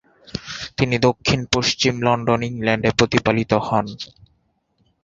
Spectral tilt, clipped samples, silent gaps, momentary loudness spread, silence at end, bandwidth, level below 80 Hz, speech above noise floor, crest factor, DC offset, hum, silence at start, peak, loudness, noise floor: -4.5 dB/octave; under 0.1%; none; 13 LU; 1 s; 7.8 kHz; -44 dBFS; 46 dB; 20 dB; under 0.1%; none; 0.35 s; -2 dBFS; -19 LUFS; -65 dBFS